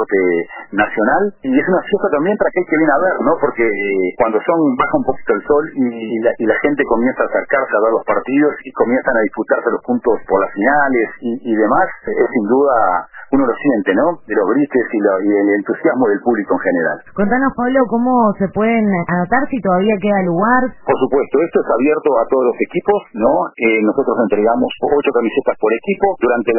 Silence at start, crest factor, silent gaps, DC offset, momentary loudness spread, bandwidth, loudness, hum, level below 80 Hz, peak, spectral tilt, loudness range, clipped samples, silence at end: 0 s; 14 dB; none; under 0.1%; 4 LU; 3.1 kHz; -15 LUFS; none; -46 dBFS; 0 dBFS; -11 dB/octave; 1 LU; under 0.1%; 0 s